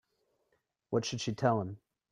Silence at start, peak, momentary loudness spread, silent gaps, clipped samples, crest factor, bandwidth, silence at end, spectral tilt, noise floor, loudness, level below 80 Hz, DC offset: 0.9 s; -14 dBFS; 12 LU; none; under 0.1%; 22 dB; 10.5 kHz; 0.35 s; -5.5 dB/octave; -79 dBFS; -34 LUFS; -70 dBFS; under 0.1%